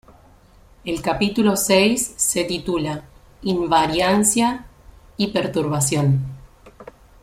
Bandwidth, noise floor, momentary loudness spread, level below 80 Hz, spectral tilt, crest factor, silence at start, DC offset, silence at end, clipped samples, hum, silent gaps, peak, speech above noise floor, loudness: 16 kHz; -50 dBFS; 13 LU; -46 dBFS; -4 dB/octave; 18 dB; 0.85 s; under 0.1%; 0.4 s; under 0.1%; none; none; -4 dBFS; 31 dB; -19 LUFS